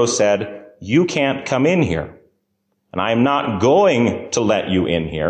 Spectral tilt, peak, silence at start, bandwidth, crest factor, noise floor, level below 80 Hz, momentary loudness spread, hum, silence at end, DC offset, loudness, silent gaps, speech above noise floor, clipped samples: -5 dB/octave; -4 dBFS; 0 s; 9.6 kHz; 14 dB; -70 dBFS; -42 dBFS; 11 LU; none; 0 s; under 0.1%; -17 LUFS; none; 53 dB; under 0.1%